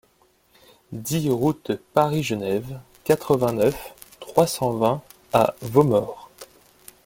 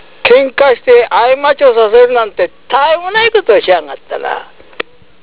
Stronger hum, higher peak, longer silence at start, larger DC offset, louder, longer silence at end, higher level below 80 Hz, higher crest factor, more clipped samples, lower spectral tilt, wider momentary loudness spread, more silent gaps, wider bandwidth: neither; about the same, -2 dBFS vs 0 dBFS; first, 0.9 s vs 0.25 s; second, under 0.1% vs 1%; second, -22 LUFS vs -9 LUFS; first, 0.6 s vs 0.4 s; second, -54 dBFS vs -48 dBFS; first, 22 dB vs 10 dB; second, under 0.1% vs 2%; about the same, -6 dB/octave vs -6.5 dB/octave; about the same, 16 LU vs 15 LU; neither; first, 17 kHz vs 4 kHz